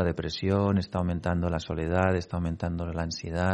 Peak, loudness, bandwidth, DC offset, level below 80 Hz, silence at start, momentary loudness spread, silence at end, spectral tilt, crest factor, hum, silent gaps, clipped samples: -8 dBFS; -29 LUFS; 8.6 kHz; under 0.1%; -48 dBFS; 0 s; 6 LU; 0 s; -7 dB/octave; 18 dB; none; none; under 0.1%